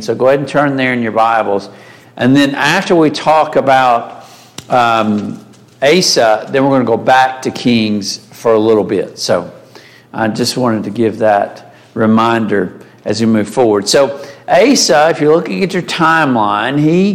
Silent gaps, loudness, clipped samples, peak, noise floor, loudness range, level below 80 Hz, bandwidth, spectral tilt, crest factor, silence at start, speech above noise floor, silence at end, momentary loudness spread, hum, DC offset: none; -12 LUFS; under 0.1%; 0 dBFS; -39 dBFS; 4 LU; -54 dBFS; 16 kHz; -4.5 dB/octave; 12 dB; 0 s; 28 dB; 0 s; 9 LU; none; under 0.1%